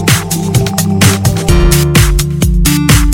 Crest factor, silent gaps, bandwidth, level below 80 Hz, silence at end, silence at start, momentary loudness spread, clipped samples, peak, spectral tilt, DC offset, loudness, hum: 8 dB; none; 17.5 kHz; -14 dBFS; 0 s; 0 s; 4 LU; 0.5%; 0 dBFS; -4.5 dB/octave; under 0.1%; -10 LUFS; none